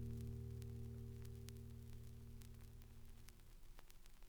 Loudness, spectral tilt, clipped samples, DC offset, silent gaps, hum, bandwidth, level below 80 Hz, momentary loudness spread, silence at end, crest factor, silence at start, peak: -56 LUFS; -6.5 dB/octave; under 0.1%; under 0.1%; none; none; over 20 kHz; -60 dBFS; 14 LU; 0 s; 24 dB; 0 s; -30 dBFS